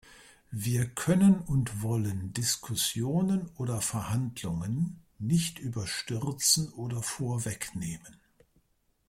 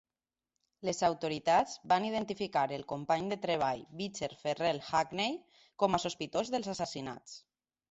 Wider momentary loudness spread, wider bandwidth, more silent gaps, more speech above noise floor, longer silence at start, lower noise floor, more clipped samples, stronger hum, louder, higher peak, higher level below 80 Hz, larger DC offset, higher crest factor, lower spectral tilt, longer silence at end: about the same, 11 LU vs 10 LU; first, 16.5 kHz vs 8.4 kHz; neither; second, 42 dB vs over 57 dB; second, 0.05 s vs 0.8 s; second, -71 dBFS vs under -90 dBFS; neither; neither; first, -30 LUFS vs -34 LUFS; first, -10 dBFS vs -14 dBFS; first, -56 dBFS vs -68 dBFS; neither; about the same, 20 dB vs 20 dB; about the same, -4.5 dB/octave vs -4 dB/octave; first, 0.95 s vs 0.5 s